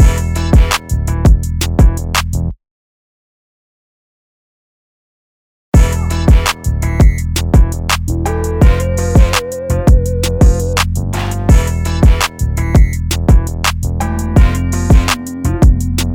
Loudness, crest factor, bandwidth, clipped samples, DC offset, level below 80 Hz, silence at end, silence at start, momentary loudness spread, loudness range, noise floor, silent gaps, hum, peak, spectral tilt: -13 LUFS; 12 dB; 17.5 kHz; under 0.1%; under 0.1%; -14 dBFS; 0 s; 0 s; 6 LU; 6 LU; under -90 dBFS; 2.71-5.72 s; none; 0 dBFS; -5.5 dB/octave